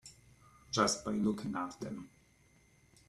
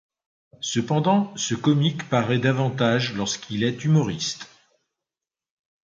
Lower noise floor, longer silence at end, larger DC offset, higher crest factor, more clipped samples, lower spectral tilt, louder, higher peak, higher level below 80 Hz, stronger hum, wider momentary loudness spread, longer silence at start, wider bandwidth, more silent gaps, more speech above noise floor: second, -67 dBFS vs under -90 dBFS; second, 1 s vs 1.4 s; neither; first, 24 dB vs 18 dB; neither; about the same, -4 dB/octave vs -5 dB/octave; second, -35 LUFS vs -23 LUFS; second, -14 dBFS vs -6 dBFS; second, -66 dBFS vs -60 dBFS; neither; first, 19 LU vs 7 LU; second, 0.05 s vs 0.6 s; first, 12.5 kHz vs 7.8 kHz; neither; second, 32 dB vs over 68 dB